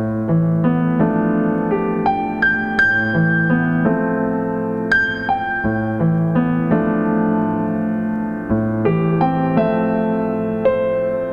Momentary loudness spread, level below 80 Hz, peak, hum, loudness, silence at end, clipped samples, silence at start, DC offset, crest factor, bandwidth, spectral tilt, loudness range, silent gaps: 4 LU; -44 dBFS; -2 dBFS; none; -18 LUFS; 0 s; under 0.1%; 0 s; 0.3%; 14 dB; 6.8 kHz; -9 dB/octave; 2 LU; none